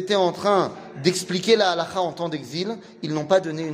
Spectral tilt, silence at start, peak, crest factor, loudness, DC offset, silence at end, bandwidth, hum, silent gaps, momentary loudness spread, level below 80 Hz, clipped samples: -4.5 dB/octave; 0 s; -4 dBFS; 18 dB; -23 LUFS; under 0.1%; 0 s; 15.5 kHz; none; none; 10 LU; -66 dBFS; under 0.1%